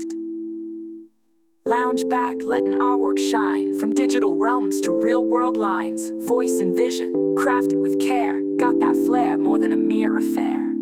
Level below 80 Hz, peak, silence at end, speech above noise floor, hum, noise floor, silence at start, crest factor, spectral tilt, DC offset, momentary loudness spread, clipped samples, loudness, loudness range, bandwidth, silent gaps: -70 dBFS; -6 dBFS; 0 s; 46 dB; none; -66 dBFS; 0 s; 14 dB; -5 dB/octave; under 0.1%; 8 LU; under 0.1%; -21 LUFS; 2 LU; 16 kHz; none